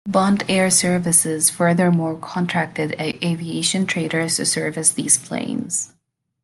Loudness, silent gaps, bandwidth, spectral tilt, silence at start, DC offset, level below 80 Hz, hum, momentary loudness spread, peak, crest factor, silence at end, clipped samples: -18 LUFS; none; 12.5 kHz; -3.5 dB/octave; 0.05 s; under 0.1%; -58 dBFS; none; 9 LU; 0 dBFS; 20 dB; 0.55 s; under 0.1%